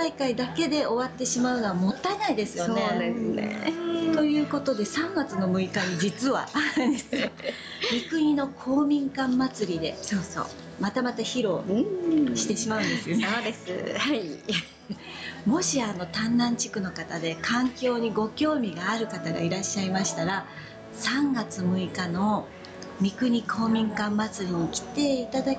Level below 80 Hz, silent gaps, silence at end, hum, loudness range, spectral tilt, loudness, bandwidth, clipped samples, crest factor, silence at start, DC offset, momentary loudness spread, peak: -60 dBFS; none; 0 s; none; 2 LU; -4.5 dB/octave; -27 LUFS; 9.6 kHz; under 0.1%; 12 dB; 0 s; under 0.1%; 7 LU; -16 dBFS